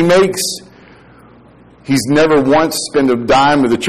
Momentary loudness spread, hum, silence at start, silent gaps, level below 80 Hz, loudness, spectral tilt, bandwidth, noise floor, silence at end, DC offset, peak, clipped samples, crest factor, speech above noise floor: 9 LU; none; 0 s; none; -42 dBFS; -12 LUFS; -4.5 dB/octave; 15.5 kHz; -43 dBFS; 0 s; 1%; -4 dBFS; under 0.1%; 10 dB; 31 dB